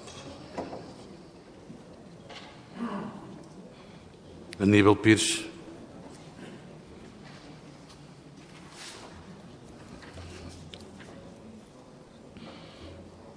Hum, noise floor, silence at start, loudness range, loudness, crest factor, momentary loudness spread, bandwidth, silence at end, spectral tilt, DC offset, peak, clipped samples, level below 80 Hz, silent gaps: none; -51 dBFS; 0 s; 20 LU; -26 LUFS; 26 dB; 26 LU; 11 kHz; 0.05 s; -4.5 dB/octave; under 0.1%; -6 dBFS; under 0.1%; -62 dBFS; none